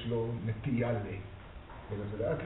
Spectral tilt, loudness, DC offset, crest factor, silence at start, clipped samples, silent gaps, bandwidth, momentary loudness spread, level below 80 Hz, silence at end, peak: -6.5 dB/octave; -36 LUFS; under 0.1%; 16 dB; 0 s; under 0.1%; none; 3.9 kHz; 17 LU; -52 dBFS; 0 s; -20 dBFS